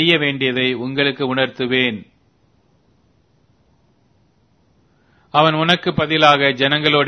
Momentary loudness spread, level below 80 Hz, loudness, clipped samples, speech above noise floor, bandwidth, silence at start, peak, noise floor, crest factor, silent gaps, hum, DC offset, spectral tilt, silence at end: 7 LU; -56 dBFS; -16 LUFS; under 0.1%; 42 dB; 11 kHz; 0 s; 0 dBFS; -59 dBFS; 18 dB; none; none; under 0.1%; -5.5 dB/octave; 0 s